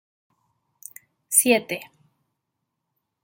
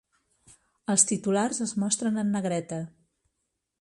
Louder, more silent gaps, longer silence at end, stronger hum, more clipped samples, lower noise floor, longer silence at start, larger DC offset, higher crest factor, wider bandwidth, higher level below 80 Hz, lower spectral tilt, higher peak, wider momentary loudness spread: first, -20 LUFS vs -26 LUFS; neither; first, 1.4 s vs 0.9 s; neither; neither; about the same, -80 dBFS vs -81 dBFS; first, 1.3 s vs 0.9 s; neither; about the same, 24 dB vs 24 dB; first, 16.5 kHz vs 11.5 kHz; about the same, -74 dBFS vs -70 dBFS; second, -1.5 dB/octave vs -4 dB/octave; about the same, -4 dBFS vs -6 dBFS; first, 25 LU vs 15 LU